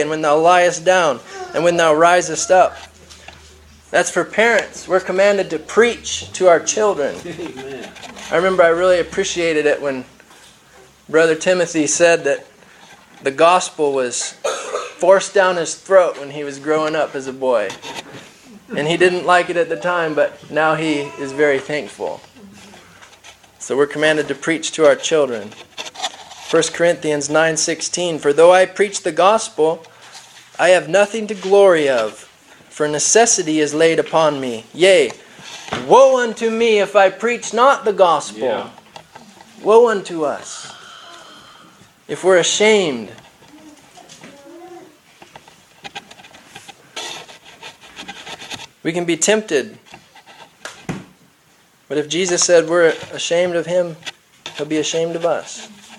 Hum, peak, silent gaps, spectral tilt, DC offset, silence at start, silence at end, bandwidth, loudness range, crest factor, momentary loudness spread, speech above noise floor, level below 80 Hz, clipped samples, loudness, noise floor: none; 0 dBFS; none; -3 dB/octave; under 0.1%; 0 s; 0.05 s; 12.5 kHz; 7 LU; 18 dB; 19 LU; 38 dB; -58 dBFS; under 0.1%; -16 LUFS; -53 dBFS